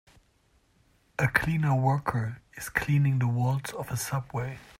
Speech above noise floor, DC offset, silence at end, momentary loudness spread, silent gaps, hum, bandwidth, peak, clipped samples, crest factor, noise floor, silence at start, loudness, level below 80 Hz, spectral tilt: 39 dB; under 0.1%; 0.15 s; 10 LU; none; none; 16 kHz; -8 dBFS; under 0.1%; 20 dB; -66 dBFS; 1.2 s; -28 LUFS; -54 dBFS; -6 dB/octave